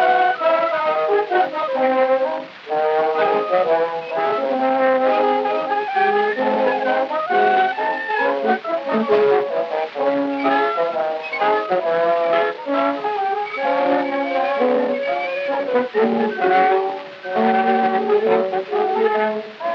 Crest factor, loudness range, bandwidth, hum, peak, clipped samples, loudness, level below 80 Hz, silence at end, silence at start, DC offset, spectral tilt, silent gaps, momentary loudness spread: 14 dB; 1 LU; 6.6 kHz; none; -4 dBFS; under 0.1%; -19 LUFS; -88 dBFS; 0 s; 0 s; under 0.1%; -6 dB/octave; none; 5 LU